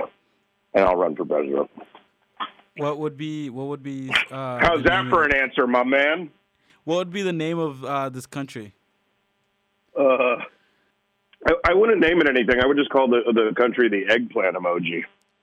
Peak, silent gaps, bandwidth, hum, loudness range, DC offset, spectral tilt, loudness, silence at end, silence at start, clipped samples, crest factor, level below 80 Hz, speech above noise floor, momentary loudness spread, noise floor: -6 dBFS; none; 13 kHz; none; 9 LU; under 0.1%; -5.5 dB/octave; -21 LUFS; 0.35 s; 0 s; under 0.1%; 18 dB; -48 dBFS; 49 dB; 15 LU; -70 dBFS